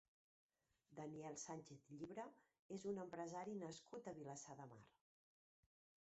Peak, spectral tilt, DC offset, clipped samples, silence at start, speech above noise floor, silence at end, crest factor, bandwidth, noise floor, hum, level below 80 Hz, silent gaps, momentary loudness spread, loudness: -38 dBFS; -6 dB/octave; under 0.1%; under 0.1%; 0.9 s; 23 dB; 1.15 s; 18 dB; 8 kHz; -77 dBFS; none; -88 dBFS; 2.59-2.69 s; 10 LU; -54 LUFS